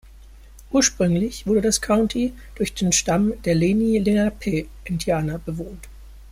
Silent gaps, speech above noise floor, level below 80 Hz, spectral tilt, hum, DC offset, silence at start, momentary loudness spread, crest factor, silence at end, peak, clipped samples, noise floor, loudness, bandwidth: none; 23 dB; -40 dBFS; -4.5 dB/octave; none; under 0.1%; 0.05 s; 11 LU; 16 dB; 0 s; -6 dBFS; under 0.1%; -44 dBFS; -21 LUFS; 16 kHz